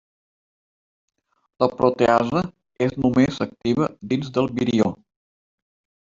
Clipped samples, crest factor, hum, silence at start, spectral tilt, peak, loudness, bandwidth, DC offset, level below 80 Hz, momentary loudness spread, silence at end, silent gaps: under 0.1%; 20 dB; none; 1.6 s; -7 dB/octave; -4 dBFS; -21 LUFS; 7.6 kHz; under 0.1%; -54 dBFS; 7 LU; 1.05 s; none